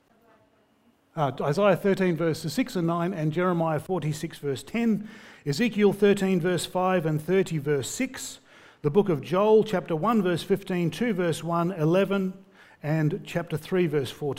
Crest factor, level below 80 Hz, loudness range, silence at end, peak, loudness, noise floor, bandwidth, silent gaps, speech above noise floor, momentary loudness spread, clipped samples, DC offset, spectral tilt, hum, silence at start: 18 dB; -60 dBFS; 2 LU; 0 s; -8 dBFS; -26 LUFS; -64 dBFS; 16 kHz; none; 39 dB; 10 LU; under 0.1%; under 0.1%; -6.5 dB/octave; none; 1.15 s